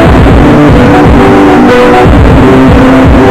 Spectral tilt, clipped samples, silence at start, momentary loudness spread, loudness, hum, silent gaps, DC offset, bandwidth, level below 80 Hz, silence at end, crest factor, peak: -7.5 dB/octave; 20%; 0 s; 0 LU; -2 LUFS; none; none; under 0.1%; 15 kHz; -10 dBFS; 0 s; 2 dB; 0 dBFS